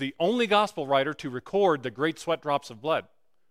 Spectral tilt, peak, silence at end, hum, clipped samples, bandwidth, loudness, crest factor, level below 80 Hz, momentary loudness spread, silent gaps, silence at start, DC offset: -5 dB/octave; -8 dBFS; 0.5 s; none; under 0.1%; 15 kHz; -27 LUFS; 18 dB; -68 dBFS; 7 LU; none; 0 s; under 0.1%